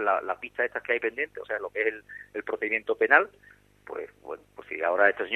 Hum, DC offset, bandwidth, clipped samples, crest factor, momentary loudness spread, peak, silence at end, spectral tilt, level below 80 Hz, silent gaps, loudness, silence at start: 50 Hz at -65 dBFS; under 0.1%; 6.2 kHz; under 0.1%; 24 dB; 19 LU; -4 dBFS; 0 s; -5 dB/octave; -68 dBFS; none; -27 LUFS; 0 s